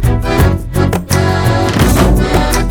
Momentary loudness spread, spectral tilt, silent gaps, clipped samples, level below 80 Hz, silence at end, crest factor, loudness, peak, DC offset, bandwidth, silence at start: 4 LU; -5.5 dB/octave; none; under 0.1%; -16 dBFS; 0 s; 10 dB; -12 LUFS; 0 dBFS; under 0.1%; 19.5 kHz; 0 s